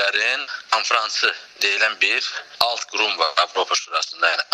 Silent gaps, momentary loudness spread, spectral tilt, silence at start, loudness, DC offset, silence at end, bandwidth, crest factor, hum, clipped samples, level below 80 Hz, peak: none; 4 LU; 1.5 dB/octave; 0 s; -20 LUFS; under 0.1%; 0.1 s; 15.5 kHz; 22 dB; none; under 0.1%; -68 dBFS; 0 dBFS